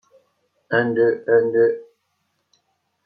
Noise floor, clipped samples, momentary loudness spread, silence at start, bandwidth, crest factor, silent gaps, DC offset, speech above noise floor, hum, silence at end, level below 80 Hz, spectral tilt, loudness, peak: -71 dBFS; under 0.1%; 6 LU; 0.7 s; 4.9 kHz; 16 dB; none; under 0.1%; 53 dB; none; 1.2 s; -74 dBFS; -9 dB/octave; -19 LUFS; -4 dBFS